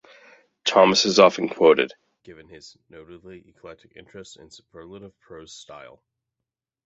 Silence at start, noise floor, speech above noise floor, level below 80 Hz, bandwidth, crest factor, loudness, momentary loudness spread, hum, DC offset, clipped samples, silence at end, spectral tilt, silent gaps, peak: 0.65 s; -87 dBFS; 64 dB; -64 dBFS; 8 kHz; 22 dB; -18 LUFS; 27 LU; none; under 0.1%; under 0.1%; 1.1 s; -3.5 dB/octave; none; -2 dBFS